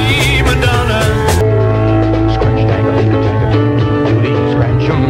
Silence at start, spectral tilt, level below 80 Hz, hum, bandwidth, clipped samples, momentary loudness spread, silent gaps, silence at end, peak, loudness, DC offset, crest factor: 0 s; -6.5 dB/octave; -22 dBFS; none; 15 kHz; under 0.1%; 2 LU; none; 0 s; 0 dBFS; -12 LUFS; under 0.1%; 10 dB